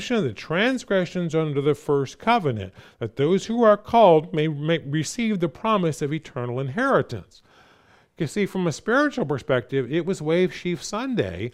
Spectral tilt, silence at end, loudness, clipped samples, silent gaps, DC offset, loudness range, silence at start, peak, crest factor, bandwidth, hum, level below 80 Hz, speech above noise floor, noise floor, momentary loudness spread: -6 dB/octave; 0.05 s; -23 LUFS; under 0.1%; none; under 0.1%; 5 LU; 0 s; -4 dBFS; 18 dB; 14.5 kHz; none; -58 dBFS; 34 dB; -57 dBFS; 10 LU